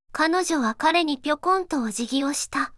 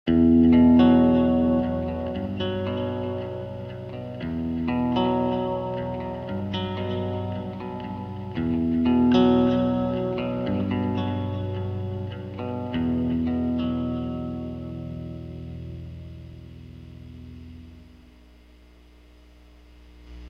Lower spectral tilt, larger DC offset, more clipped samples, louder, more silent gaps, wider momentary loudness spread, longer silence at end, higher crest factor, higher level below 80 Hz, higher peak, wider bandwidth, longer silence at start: second, -2 dB/octave vs -9.5 dB/octave; neither; neither; about the same, -23 LUFS vs -24 LUFS; neither; second, 5 LU vs 21 LU; about the same, 0 s vs 0 s; about the same, 16 dB vs 18 dB; second, -58 dBFS vs -44 dBFS; about the same, -8 dBFS vs -8 dBFS; first, 12 kHz vs 5.4 kHz; about the same, 0.15 s vs 0.05 s